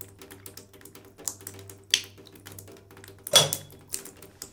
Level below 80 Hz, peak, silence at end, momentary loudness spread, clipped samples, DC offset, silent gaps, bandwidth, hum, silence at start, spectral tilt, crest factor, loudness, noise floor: -66 dBFS; -2 dBFS; 0.05 s; 28 LU; under 0.1%; under 0.1%; none; 19 kHz; none; 0 s; -0.5 dB/octave; 28 dB; -25 LUFS; -50 dBFS